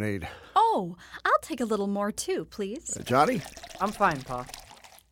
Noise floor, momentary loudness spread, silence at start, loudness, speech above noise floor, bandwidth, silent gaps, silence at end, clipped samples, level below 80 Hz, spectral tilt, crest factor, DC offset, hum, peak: -52 dBFS; 13 LU; 0 s; -28 LUFS; 23 dB; 17 kHz; none; 0.25 s; under 0.1%; -56 dBFS; -4.5 dB/octave; 22 dB; under 0.1%; none; -8 dBFS